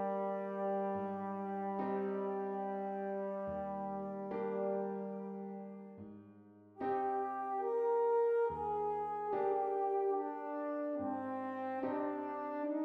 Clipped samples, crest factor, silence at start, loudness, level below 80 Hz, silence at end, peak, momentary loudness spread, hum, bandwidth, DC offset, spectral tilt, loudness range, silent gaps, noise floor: under 0.1%; 12 dB; 0 s; -38 LUFS; -74 dBFS; 0 s; -24 dBFS; 9 LU; none; 4.7 kHz; under 0.1%; -9.5 dB/octave; 6 LU; none; -59 dBFS